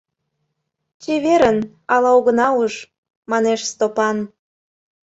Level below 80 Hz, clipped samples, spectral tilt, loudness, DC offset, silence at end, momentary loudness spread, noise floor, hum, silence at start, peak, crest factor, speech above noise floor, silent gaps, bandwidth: -58 dBFS; under 0.1%; -4 dB/octave; -17 LUFS; under 0.1%; 0.8 s; 11 LU; -74 dBFS; none; 1 s; -2 dBFS; 16 dB; 58 dB; 2.98-3.03 s, 3.16-3.23 s; 8 kHz